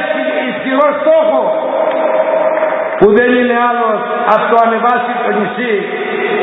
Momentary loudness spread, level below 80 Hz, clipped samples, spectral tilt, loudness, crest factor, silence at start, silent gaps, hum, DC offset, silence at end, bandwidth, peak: 6 LU; -50 dBFS; under 0.1%; -8 dB/octave; -12 LUFS; 12 dB; 0 s; none; none; under 0.1%; 0 s; 4 kHz; 0 dBFS